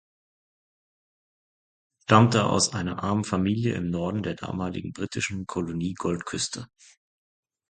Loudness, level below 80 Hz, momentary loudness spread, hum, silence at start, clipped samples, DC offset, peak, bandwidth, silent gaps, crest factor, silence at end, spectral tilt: -26 LUFS; -52 dBFS; 12 LU; none; 2.1 s; under 0.1%; under 0.1%; 0 dBFS; 9.4 kHz; none; 26 dB; 1.05 s; -5 dB/octave